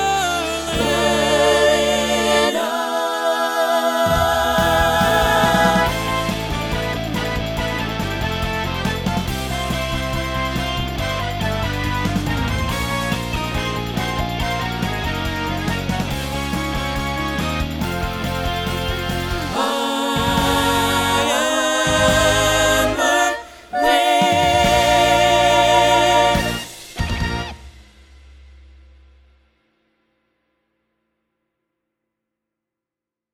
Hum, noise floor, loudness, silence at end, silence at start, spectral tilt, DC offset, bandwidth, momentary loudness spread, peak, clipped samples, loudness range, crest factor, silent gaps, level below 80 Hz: none; -87 dBFS; -18 LUFS; 5.55 s; 0 s; -4 dB/octave; under 0.1%; 19.5 kHz; 9 LU; -2 dBFS; under 0.1%; 7 LU; 18 dB; none; -32 dBFS